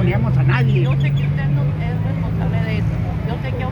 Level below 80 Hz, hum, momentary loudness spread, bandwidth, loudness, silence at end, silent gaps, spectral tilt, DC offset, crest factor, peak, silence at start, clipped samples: -30 dBFS; none; 7 LU; 5.6 kHz; -19 LUFS; 0 s; none; -9 dB/octave; under 0.1%; 12 dB; -6 dBFS; 0 s; under 0.1%